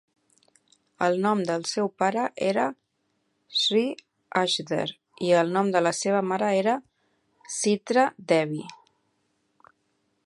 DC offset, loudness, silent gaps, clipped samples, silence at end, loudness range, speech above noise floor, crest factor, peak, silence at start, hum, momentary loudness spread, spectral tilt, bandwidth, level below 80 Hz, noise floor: under 0.1%; -25 LUFS; none; under 0.1%; 1.5 s; 3 LU; 49 dB; 20 dB; -6 dBFS; 1 s; none; 9 LU; -4 dB/octave; 11.5 kHz; -76 dBFS; -74 dBFS